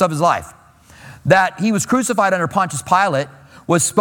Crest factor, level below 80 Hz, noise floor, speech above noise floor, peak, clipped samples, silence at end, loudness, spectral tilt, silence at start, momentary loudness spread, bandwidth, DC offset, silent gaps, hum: 16 dB; -52 dBFS; -44 dBFS; 27 dB; 0 dBFS; under 0.1%; 0 s; -17 LUFS; -4.5 dB/octave; 0 s; 9 LU; 19 kHz; under 0.1%; none; none